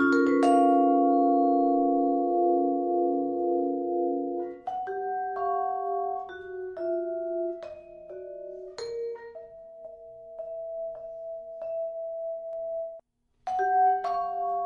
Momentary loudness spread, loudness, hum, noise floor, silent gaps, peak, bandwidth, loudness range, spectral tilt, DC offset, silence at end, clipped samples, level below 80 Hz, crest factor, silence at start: 19 LU; -27 LUFS; none; -58 dBFS; none; -10 dBFS; 8.8 kHz; 15 LU; -5.5 dB/octave; under 0.1%; 0 s; under 0.1%; -68 dBFS; 18 dB; 0 s